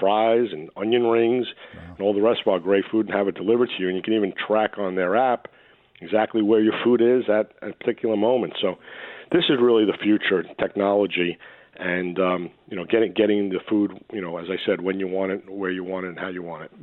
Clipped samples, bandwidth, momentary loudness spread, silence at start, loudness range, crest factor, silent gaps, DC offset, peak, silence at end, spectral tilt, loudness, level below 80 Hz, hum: under 0.1%; 4.2 kHz; 12 LU; 0 s; 3 LU; 18 dB; none; under 0.1%; -4 dBFS; 0.15 s; -9 dB/octave; -22 LUFS; -66 dBFS; none